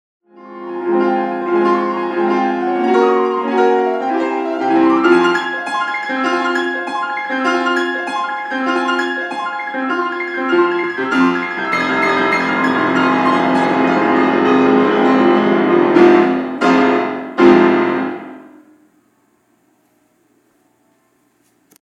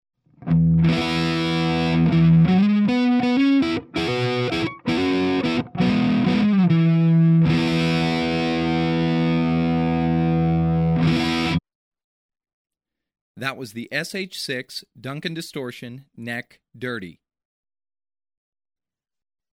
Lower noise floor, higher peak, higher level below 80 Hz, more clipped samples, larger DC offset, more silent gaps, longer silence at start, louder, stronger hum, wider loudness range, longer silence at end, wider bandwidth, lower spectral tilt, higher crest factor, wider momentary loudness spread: second, -59 dBFS vs under -90 dBFS; first, 0 dBFS vs -8 dBFS; second, -62 dBFS vs -44 dBFS; neither; neither; second, none vs 11.75-11.92 s, 12.04-12.29 s, 12.53-12.65 s, 13.21-13.35 s; about the same, 0.4 s vs 0.4 s; first, -15 LUFS vs -20 LUFS; neither; second, 6 LU vs 14 LU; first, 3.35 s vs 2.4 s; second, 9.6 kHz vs 11 kHz; about the same, -6 dB/octave vs -7 dB/octave; about the same, 16 dB vs 14 dB; second, 9 LU vs 14 LU